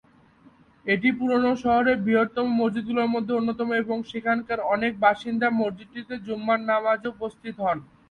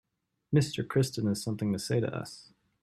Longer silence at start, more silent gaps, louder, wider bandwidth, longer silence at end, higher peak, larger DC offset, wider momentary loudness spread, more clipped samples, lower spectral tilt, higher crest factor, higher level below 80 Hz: first, 0.85 s vs 0.5 s; neither; first, -24 LUFS vs -31 LUFS; second, 6.8 kHz vs 14 kHz; second, 0.25 s vs 0.4 s; first, -6 dBFS vs -12 dBFS; neither; about the same, 11 LU vs 11 LU; neither; about the same, -7 dB/octave vs -6 dB/octave; about the same, 18 dB vs 18 dB; about the same, -60 dBFS vs -64 dBFS